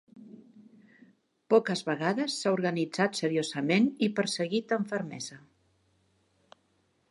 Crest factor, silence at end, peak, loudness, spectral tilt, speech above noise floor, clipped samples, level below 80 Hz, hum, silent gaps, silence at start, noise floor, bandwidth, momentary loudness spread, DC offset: 20 dB; 1.75 s; -10 dBFS; -29 LUFS; -5 dB/octave; 43 dB; under 0.1%; -80 dBFS; none; none; 0.15 s; -72 dBFS; 11.5 kHz; 8 LU; under 0.1%